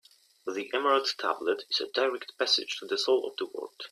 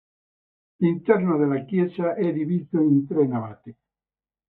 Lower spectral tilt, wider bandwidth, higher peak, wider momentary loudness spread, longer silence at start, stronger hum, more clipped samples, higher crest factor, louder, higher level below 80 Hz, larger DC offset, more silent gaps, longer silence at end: second, -1 dB/octave vs -12.5 dB/octave; first, 14 kHz vs 4.1 kHz; second, -12 dBFS vs -4 dBFS; first, 11 LU vs 5 LU; second, 0.45 s vs 0.8 s; neither; neither; about the same, 18 dB vs 20 dB; second, -29 LUFS vs -23 LUFS; second, -82 dBFS vs -68 dBFS; neither; neither; second, 0.05 s vs 0.75 s